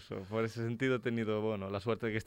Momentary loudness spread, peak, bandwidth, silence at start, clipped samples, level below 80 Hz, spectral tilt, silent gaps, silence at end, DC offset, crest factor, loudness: 4 LU; -20 dBFS; 16 kHz; 0 s; under 0.1%; -66 dBFS; -7 dB/octave; none; 0 s; under 0.1%; 14 dB; -35 LUFS